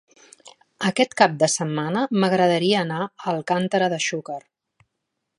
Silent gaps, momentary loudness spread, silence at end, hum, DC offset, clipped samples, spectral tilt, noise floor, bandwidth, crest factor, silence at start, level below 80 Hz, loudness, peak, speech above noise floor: none; 9 LU; 1 s; none; under 0.1%; under 0.1%; -4.5 dB/octave; -79 dBFS; 11.5 kHz; 22 dB; 0.8 s; -70 dBFS; -21 LUFS; 0 dBFS; 58 dB